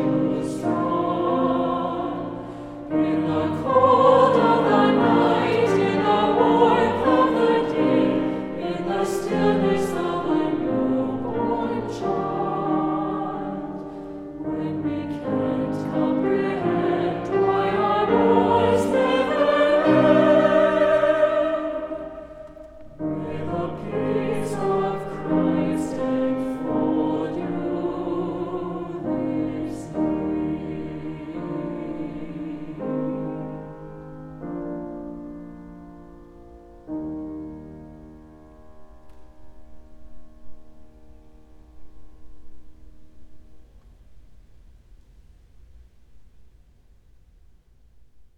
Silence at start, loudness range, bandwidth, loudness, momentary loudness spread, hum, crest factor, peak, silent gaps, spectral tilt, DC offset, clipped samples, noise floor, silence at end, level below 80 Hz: 0 s; 17 LU; 12.5 kHz; -22 LUFS; 17 LU; none; 20 dB; -4 dBFS; none; -7 dB/octave; under 0.1%; under 0.1%; -53 dBFS; 0.1 s; -50 dBFS